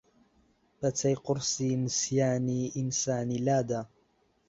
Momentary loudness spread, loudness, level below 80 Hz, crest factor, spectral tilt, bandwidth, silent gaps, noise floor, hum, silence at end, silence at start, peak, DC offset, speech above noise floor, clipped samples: 6 LU; -30 LUFS; -64 dBFS; 16 dB; -5 dB/octave; 8 kHz; none; -70 dBFS; none; 0.65 s; 0.8 s; -14 dBFS; under 0.1%; 40 dB; under 0.1%